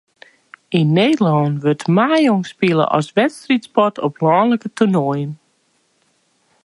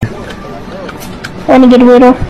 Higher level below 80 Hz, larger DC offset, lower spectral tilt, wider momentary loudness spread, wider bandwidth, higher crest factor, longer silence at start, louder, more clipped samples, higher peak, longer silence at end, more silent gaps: second, -64 dBFS vs -30 dBFS; neither; about the same, -7 dB/octave vs -7 dB/octave; second, 5 LU vs 20 LU; second, 11.5 kHz vs 13.5 kHz; first, 16 dB vs 8 dB; first, 0.7 s vs 0 s; second, -16 LUFS vs -4 LUFS; second, under 0.1% vs 9%; about the same, -2 dBFS vs 0 dBFS; first, 1.3 s vs 0 s; neither